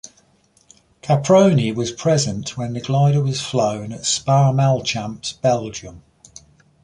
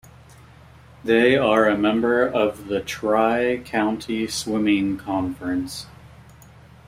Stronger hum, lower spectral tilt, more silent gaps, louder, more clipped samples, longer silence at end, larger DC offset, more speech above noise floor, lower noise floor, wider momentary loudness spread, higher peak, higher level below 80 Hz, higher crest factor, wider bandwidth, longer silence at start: neither; about the same, -5.5 dB/octave vs -5 dB/octave; neither; first, -18 LUFS vs -21 LUFS; neither; about the same, 0.85 s vs 0.8 s; neither; first, 40 dB vs 26 dB; first, -58 dBFS vs -47 dBFS; about the same, 12 LU vs 10 LU; about the same, -2 dBFS vs -4 dBFS; about the same, -52 dBFS vs -52 dBFS; about the same, 16 dB vs 18 dB; second, 10.5 kHz vs 16 kHz; about the same, 1.05 s vs 1.05 s